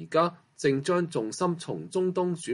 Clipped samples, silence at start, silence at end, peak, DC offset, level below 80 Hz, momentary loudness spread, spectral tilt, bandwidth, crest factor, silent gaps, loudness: under 0.1%; 0 s; 0 s; -10 dBFS; under 0.1%; -72 dBFS; 5 LU; -5.5 dB/octave; 11.5 kHz; 18 dB; none; -28 LUFS